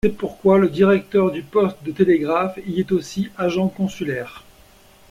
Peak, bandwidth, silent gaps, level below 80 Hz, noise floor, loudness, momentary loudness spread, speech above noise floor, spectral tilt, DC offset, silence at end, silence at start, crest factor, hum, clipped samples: -4 dBFS; 15 kHz; none; -48 dBFS; -50 dBFS; -20 LUFS; 10 LU; 31 dB; -7 dB/octave; under 0.1%; 0.7 s; 0.05 s; 16 dB; none; under 0.1%